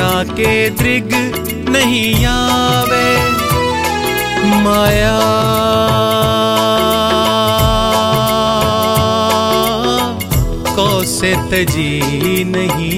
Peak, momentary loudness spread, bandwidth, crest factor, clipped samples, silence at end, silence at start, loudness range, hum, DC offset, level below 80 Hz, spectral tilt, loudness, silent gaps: 0 dBFS; 4 LU; 17 kHz; 12 dB; under 0.1%; 0 s; 0 s; 2 LU; none; under 0.1%; -28 dBFS; -4.5 dB/octave; -13 LUFS; none